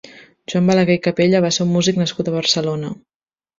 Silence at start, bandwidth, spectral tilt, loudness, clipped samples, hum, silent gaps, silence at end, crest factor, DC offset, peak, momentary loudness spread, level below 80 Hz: 0.05 s; 7.6 kHz; -5 dB/octave; -17 LUFS; under 0.1%; none; none; 0.65 s; 16 dB; under 0.1%; -2 dBFS; 12 LU; -56 dBFS